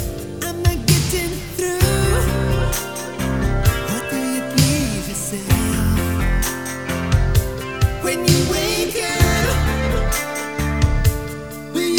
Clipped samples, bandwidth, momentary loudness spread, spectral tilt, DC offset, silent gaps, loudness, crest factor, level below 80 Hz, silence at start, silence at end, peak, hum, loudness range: under 0.1%; over 20 kHz; 8 LU; -4.5 dB/octave; 0.4%; none; -19 LUFS; 18 dB; -24 dBFS; 0 s; 0 s; -2 dBFS; none; 2 LU